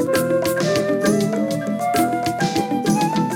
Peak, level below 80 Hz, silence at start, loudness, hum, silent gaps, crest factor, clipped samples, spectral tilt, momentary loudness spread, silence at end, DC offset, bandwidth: -6 dBFS; -54 dBFS; 0 s; -20 LUFS; none; none; 12 dB; under 0.1%; -5 dB/octave; 3 LU; 0 s; under 0.1%; 18 kHz